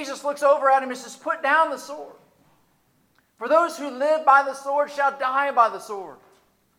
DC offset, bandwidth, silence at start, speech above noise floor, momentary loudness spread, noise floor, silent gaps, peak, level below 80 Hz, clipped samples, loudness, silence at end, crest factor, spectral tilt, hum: under 0.1%; 16 kHz; 0 s; 42 dB; 17 LU; -64 dBFS; none; -4 dBFS; -78 dBFS; under 0.1%; -21 LUFS; 0.65 s; 18 dB; -2 dB/octave; none